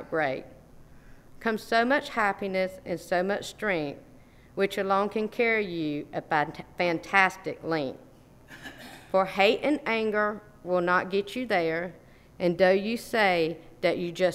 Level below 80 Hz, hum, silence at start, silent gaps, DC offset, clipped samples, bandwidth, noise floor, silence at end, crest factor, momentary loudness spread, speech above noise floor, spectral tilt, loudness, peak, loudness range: -58 dBFS; none; 0 s; none; under 0.1%; under 0.1%; 16 kHz; -53 dBFS; 0 s; 22 dB; 13 LU; 26 dB; -5 dB/octave; -27 LUFS; -6 dBFS; 3 LU